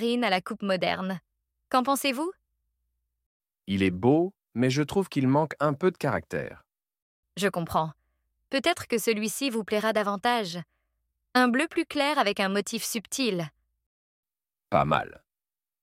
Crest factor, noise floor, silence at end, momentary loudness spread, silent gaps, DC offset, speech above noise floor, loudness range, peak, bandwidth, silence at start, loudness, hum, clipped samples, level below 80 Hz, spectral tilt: 22 dB; under -90 dBFS; 0.75 s; 11 LU; 3.26-3.40 s, 7.02-7.23 s, 13.86-14.23 s; under 0.1%; over 64 dB; 4 LU; -6 dBFS; 16.5 kHz; 0 s; -27 LUFS; none; under 0.1%; -62 dBFS; -4.5 dB/octave